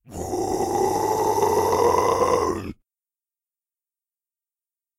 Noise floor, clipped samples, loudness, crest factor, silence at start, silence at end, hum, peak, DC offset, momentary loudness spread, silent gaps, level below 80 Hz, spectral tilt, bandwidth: under -90 dBFS; under 0.1%; -22 LUFS; 18 dB; 0.1 s; 2.25 s; none; -6 dBFS; under 0.1%; 9 LU; none; -50 dBFS; -4.5 dB/octave; 16 kHz